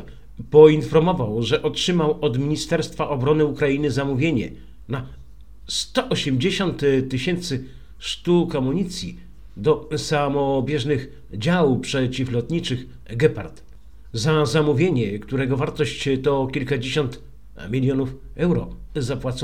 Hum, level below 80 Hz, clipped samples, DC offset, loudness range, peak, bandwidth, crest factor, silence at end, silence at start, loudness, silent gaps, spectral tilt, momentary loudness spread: none; -44 dBFS; under 0.1%; 0.8%; 3 LU; 0 dBFS; 14 kHz; 22 dB; 0 s; 0 s; -21 LUFS; none; -6 dB/octave; 12 LU